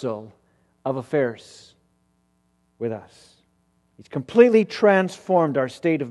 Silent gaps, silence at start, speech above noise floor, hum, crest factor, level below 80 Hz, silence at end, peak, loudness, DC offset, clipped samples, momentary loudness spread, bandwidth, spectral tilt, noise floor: none; 0 s; 45 dB; none; 22 dB; -68 dBFS; 0 s; -2 dBFS; -21 LUFS; under 0.1%; under 0.1%; 17 LU; 11.5 kHz; -7 dB/octave; -67 dBFS